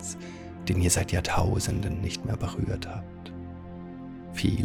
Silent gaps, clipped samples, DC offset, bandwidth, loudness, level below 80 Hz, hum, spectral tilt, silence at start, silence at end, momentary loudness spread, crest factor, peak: none; under 0.1%; under 0.1%; 17 kHz; -29 LUFS; -42 dBFS; none; -5 dB/octave; 0 s; 0 s; 17 LU; 20 dB; -10 dBFS